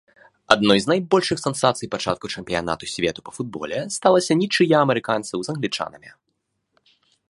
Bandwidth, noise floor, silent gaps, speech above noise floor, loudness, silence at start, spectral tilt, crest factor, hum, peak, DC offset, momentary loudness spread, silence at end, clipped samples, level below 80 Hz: 11.5 kHz; -74 dBFS; none; 53 dB; -21 LUFS; 0.5 s; -4.5 dB/octave; 22 dB; none; 0 dBFS; under 0.1%; 11 LU; 1.2 s; under 0.1%; -56 dBFS